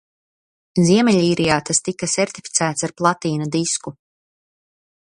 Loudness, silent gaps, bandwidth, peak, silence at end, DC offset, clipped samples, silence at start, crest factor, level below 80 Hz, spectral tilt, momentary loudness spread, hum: -18 LUFS; none; 11.5 kHz; 0 dBFS; 1.2 s; under 0.1%; under 0.1%; 0.75 s; 20 dB; -56 dBFS; -4 dB/octave; 8 LU; none